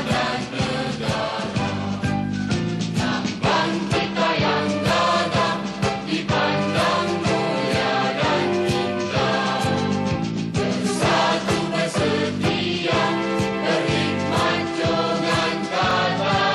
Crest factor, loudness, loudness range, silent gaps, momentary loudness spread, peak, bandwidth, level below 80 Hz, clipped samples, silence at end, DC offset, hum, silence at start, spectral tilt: 14 dB; -21 LUFS; 2 LU; none; 5 LU; -8 dBFS; 12.5 kHz; -46 dBFS; under 0.1%; 0 s; under 0.1%; none; 0 s; -5 dB/octave